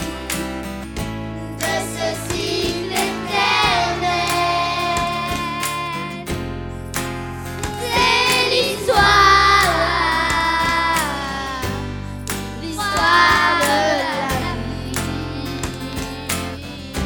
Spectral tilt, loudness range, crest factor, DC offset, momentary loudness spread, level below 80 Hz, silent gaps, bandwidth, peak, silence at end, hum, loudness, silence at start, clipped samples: -3 dB/octave; 8 LU; 18 dB; under 0.1%; 14 LU; -36 dBFS; none; over 20 kHz; 0 dBFS; 0 s; none; -18 LUFS; 0 s; under 0.1%